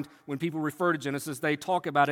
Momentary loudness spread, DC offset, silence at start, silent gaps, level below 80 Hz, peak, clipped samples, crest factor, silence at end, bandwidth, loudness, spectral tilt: 6 LU; under 0.1%; 0 s; none; -74 dBFS; -10 dBFS; under 0.1%; 20 dB; 0 s; 17 kHz; -30 LUFS; -5.5 dB/octave